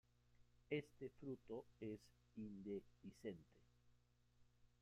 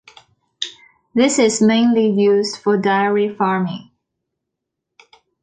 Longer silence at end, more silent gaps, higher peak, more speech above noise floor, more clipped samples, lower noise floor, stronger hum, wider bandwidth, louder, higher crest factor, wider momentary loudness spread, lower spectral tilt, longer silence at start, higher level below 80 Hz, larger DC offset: second, 0.15 s vs 1.6 s; neither; second, -34 dBFS vs -4 dBFS; second, 24 dB vs 64 dB; neither; about the same, -78 dBFS vs -80 dBFS; first, 60 Hz at -75 dBFS vs none; first, 14.5 kHz vs 9.4 kHz; second, -54 LUFS vs -17 LUFS; first, 22 dB vs 14 dB; second, 10 LU vs 14 LU; first, -7 dB/octave vs -4.5 dB/octave; second, 0.3 s vs 0.6 s; second, -80 dBFS vs -64 dBFS; neither